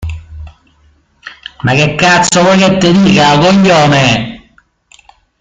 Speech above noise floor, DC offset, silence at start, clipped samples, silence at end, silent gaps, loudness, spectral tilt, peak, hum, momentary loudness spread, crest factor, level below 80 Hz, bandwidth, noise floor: 42 dB; under 0.1%; 0 s; under 0.1%; 1.05 s; none; -8 LUFS; -4.5 dB/octave; 0 dBFS; none; 18 LU; 10 dB; -36 dBFS; 9.4 kHz; -50 dBFS